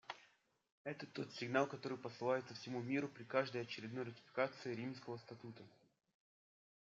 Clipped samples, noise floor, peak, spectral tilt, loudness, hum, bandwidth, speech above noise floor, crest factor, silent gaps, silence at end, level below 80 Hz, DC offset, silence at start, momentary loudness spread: under 0.1%; -75 dBFS; -22 dBFS; -6 dB/octave; -44 LUFS; none; 7.6 kHz; 31 dB; 22 dB; 0.72-0.85 s; 1.1 s; under -90 dBFS; under 0.1%; 0.1 s; 14 LU